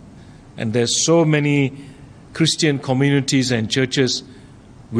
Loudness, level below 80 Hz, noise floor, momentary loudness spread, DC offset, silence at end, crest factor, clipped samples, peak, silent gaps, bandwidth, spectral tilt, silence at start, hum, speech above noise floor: -18 LUFS; -52 dBFS; -43 dBFS; 9 LU; under 0.1%; 0 s; 14 dB; under 0.1%; -4 dBFS; none; 12.5 kHz; -4.5 dB/octave; 0.05 s; none; 25 dB